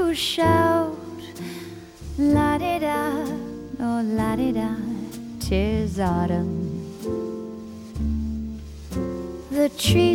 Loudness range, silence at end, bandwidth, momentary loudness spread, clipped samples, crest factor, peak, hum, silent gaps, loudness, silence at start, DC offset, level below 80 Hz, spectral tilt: 5 LU; 0 s; 17.5 kHz; 16 LU; under 0.1%; 18 dB; -6 dBFS; none; none; -24 LUFS; 0 s; under 0.1%; -38 dBFS; -6 dB/octave